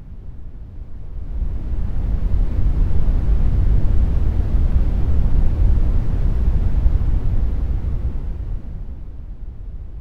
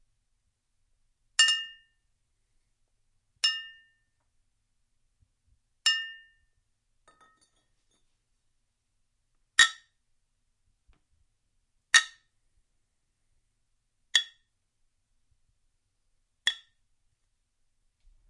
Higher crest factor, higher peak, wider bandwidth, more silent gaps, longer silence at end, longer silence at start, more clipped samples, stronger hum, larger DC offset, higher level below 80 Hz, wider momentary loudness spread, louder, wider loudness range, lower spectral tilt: second, 14 dB vs 32 dB; about the same, -2 dBFS vs -4 dBFS; second, 3.4 kHz vs 11.5 kHz; neither; second, 0 s vs 1.75 s; second, 0 s vs 1.4 s; neither; neither; neither; first, -18 dBFS vs -72 dBFS; second, 16 LU vs 20 LU; first, -22 LUFS vs -25 LUFS; second, 4 LU vs 7 LU; first, -10 dB/octave vs 4.5 dB/octave